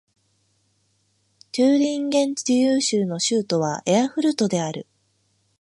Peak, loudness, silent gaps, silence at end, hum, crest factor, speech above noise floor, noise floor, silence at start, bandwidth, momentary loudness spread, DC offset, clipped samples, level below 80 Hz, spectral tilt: -6 dBFS; -21 LUFS; none; 0.8 s; none; 16 dB; 46 dB; -67 dBFS; 1.55 s; 11.5 kHz; 6 LU; under 0.1%; under 0.1%; -72 dBFS; -4.5 dB/octave